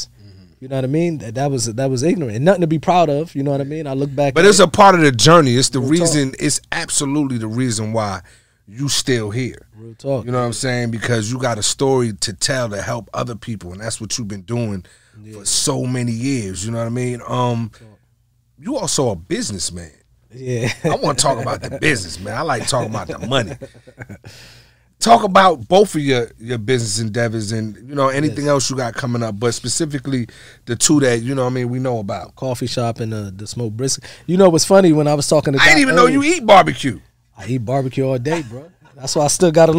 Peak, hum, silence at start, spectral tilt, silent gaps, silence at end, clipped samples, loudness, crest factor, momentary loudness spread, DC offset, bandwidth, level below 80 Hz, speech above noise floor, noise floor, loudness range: 0 dBFS; none; 0 s; -4.5 dB/octave; none; 0 s; under 0.1%; -17 LUFS; 16 dB; 15 LU; 0.6%; 16 kHz; -48 dBFS; 42 dB; -59 dBFS; 9 LU